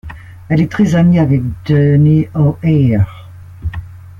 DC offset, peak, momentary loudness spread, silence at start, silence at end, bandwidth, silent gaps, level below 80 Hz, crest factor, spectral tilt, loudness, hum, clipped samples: under 0.1%; -2 dBFS; 15 LU; 0.05 s; 0.1 s; 7.2 kHz; none; -36 dBFS; 12 dB; -9 dB/octave; -12 LUFS; none; under 0.1%